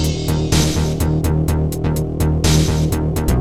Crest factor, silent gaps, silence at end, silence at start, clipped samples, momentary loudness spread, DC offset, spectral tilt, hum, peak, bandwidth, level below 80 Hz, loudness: 14 dB; none; 0 s; 0 s; under 0.1%; 4 LU; under 0.1%; -5.5 dB/octave; none; -4 dBFS; 17 kHz; -22 dBFS; -17 LUFS